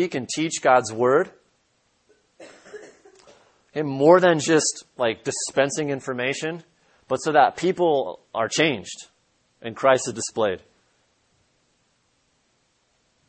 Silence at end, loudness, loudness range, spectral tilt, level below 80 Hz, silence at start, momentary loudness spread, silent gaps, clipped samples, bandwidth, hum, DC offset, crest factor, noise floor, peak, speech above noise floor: 2.7 s; -22 LUFS; 6 LU; -4 dB/octave; -68 dBFS; 0 s; 18 LU; none; under 0.1%; 8.8 kHz; none; under 0.1%; 24 dB; -67 dBFS; 0 dBFS; 46 dB